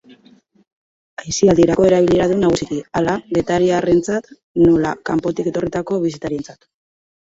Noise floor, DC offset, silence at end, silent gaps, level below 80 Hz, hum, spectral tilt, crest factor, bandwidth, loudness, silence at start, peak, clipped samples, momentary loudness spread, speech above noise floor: -51 dBFS; under 0.1%; 0.7 s; 4.43-4.55 s; -44 dBFS; none; -6 dB/octave; 16 dB; 8 kHz; -17 LUFS; 1.2 s; -2 dBFS; under 0.1%; 13 LU; 35 dB